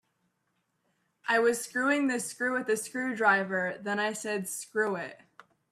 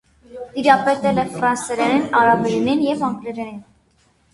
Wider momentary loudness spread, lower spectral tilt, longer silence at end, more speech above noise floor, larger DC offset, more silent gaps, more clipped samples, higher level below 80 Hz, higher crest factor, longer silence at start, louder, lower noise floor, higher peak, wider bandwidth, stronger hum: second, 8 LU vs 15 LU; second, -3.5 dB/octave vs -5 dB/octave; second, 0.55 s vs 0.7 s; first, 48 dB vs 41 dB; neither; neither; neither; second, -80 dBFS vs -54 dBFS; about the same, 20 dB vs 18 dB; first, 1.25 s vs 0.3 s; second, -29 LUFS vs -18 LUFS; first, -77 dBFS vs -59 dBFS; second, -12 dBFS vs 0 dBFS; first, 15.5 kHz vs 11.5 kHz; neither